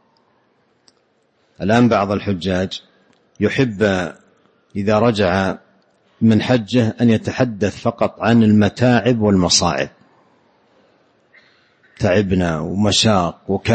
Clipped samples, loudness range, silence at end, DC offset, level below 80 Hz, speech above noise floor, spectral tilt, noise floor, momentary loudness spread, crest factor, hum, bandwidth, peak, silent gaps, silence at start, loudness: under 0.1%; 5 LU; 0 s; under 0.1%; -46 dBFS; 45 dB; -5 dB/octave; -61 dBFS; 9 LU; 16 dB; none; 8.8 kHz; -2 dBFS; none; 1.6 s; -17 LUFS